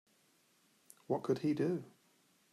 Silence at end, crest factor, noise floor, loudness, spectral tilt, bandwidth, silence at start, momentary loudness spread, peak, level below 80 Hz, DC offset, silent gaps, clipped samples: 0.65 s; 18 dB; -72 dBFS; -37 LUFS; -7.5 dB/octave; 14 kHz; 1.1 s; 6 LU; -22 dBFS; -84 dBFS; under 0.1%; none; under 0.1%